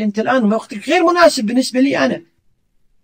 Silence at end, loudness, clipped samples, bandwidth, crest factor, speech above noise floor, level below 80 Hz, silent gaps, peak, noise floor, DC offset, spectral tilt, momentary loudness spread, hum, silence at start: 0.85 s; -15 LUFS; under 0.1%; 16 kHz; 16 dB; 46 dB; -58 dBFS; none; 0 dBFS; -60 dBFS; under 0.1%; -4.5 dB/octave; 8 LU; none; 0 s